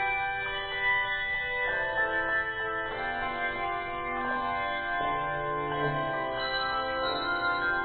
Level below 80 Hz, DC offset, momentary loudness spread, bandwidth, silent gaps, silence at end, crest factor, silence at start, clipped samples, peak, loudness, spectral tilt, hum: -52 dBFS; under 0.1%; 5 LU; 4.6 kHz; none; 0 s; 14 dB; 0 s; under 0.1%; -18 dBFS; -29 LUFS; -1 dB/octave; none